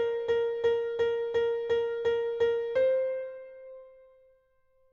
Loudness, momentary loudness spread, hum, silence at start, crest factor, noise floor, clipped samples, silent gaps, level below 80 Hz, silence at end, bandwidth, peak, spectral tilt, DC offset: -29 LUFS; 16 LU; none; 0 s; 12 dB; -67 dBFS; under 0.1%; none; -64 dBFS; 1 s; 6.8 kHz; -18 dBFS; -4.5 dB/octave; under 0.1%